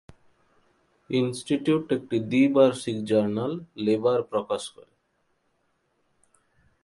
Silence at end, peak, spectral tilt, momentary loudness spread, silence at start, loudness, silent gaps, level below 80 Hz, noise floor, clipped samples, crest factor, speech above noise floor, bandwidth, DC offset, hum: 2.15 s; -6 dBFS; -6 dB/octave; 10 LU; 1.1 s; -25 LUFS; none; -66 dBFS; -72 dBFS; under 0.1%; 20 dB; 47 dB; 11.5 kHz; under 0.1%; none